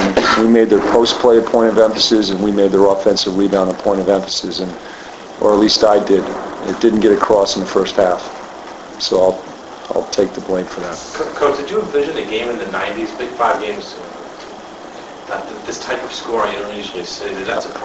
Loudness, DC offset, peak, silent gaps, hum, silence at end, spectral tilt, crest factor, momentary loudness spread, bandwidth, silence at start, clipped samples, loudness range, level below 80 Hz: -15 LUFS; under 0.1%; 0 dBFS; none; none; 0 s; -4 dB/octave; 16 dB; 20 LU; 8.2 kHz; 0 s; under 0.1%; 10 LU; -46 dBFS